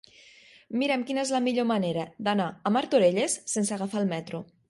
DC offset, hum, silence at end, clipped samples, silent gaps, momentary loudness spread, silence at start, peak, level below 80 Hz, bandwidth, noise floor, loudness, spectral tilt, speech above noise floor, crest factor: under 0.1%; none; 0.25 s; under 0.1%; none; 8 LU; 0.7 s; -10 dBFS; -72 dBFS; 11.5 kHz; -55 dBFS; -27 LUFS; -4.5 dB/octave; 28 dB; 18 dB